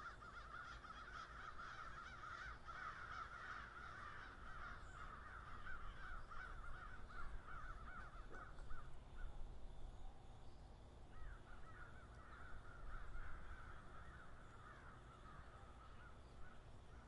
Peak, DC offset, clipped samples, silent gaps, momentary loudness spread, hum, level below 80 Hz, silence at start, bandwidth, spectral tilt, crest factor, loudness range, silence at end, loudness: -36 dBFS; under 0.1%; under 0.1%; none; 9 LU; none; -58 dBFS; 0 s; 11 kHz; -5 dB/octave; 16 dB; 7 LU; 0 s; -57 LUFS